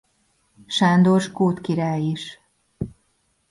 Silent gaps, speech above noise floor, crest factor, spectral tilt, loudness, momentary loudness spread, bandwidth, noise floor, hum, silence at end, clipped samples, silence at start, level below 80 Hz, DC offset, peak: none; 48 dB; 16 dB; -6.5 dB/octave; -20 LUFS; 18 LU; 11.5 kHz; -67 dBFS; none; 0.6 s; under 0.1%; 0.7 s; -54 dBFS; under 0.1%; -6 dBFS